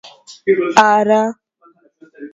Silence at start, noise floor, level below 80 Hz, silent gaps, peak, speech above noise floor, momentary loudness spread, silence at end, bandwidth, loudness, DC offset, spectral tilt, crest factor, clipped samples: 0.05 s; -53 dBFS; -60 dBFS; none; 0 dBFS; 39 dB; 11 LU; 0.05 s; 9.2 kHz; -14 LUFS; under 0.1%; -4 dB/octave; 16 dB; 0.1%